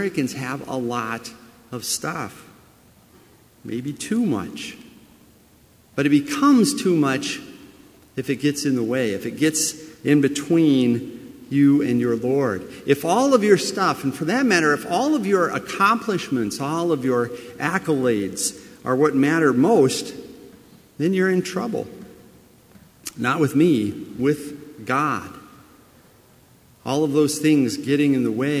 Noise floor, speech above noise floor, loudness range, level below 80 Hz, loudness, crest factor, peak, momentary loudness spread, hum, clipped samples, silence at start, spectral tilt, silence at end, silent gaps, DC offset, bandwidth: -53 dBFS; 33 dB; 9 LU; -60 dBFS; -21 LUFS; 20 dB; -2 dBFS; 15 LU; none; under 0.1%; 0 s; -5 dB/octave; 0 s; none; under 0.1%; 16 kHz